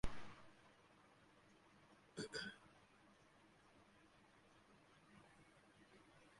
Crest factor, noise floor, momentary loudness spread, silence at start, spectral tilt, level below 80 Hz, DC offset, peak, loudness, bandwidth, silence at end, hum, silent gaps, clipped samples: 26 dB; -71 dBFS; 19 LU; 0.05 s; -4 dB/octave; -66 dBFS; under 0.1%; -28 dBFS; -54 LUFS; 11 kHz; 0.1 s; none; none; under 0.1%